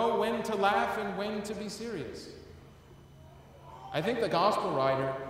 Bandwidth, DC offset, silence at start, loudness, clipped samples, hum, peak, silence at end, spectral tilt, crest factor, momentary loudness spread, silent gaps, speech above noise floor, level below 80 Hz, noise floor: 16 kHz; under 0.1%; 0 s; -31 LUFS; under 0.1%; none; -14 dBFS; 0 s; -5 dB/octave; 18 dB; 20 LU; none; 23 dB; -62 dBFS; -54 dBFS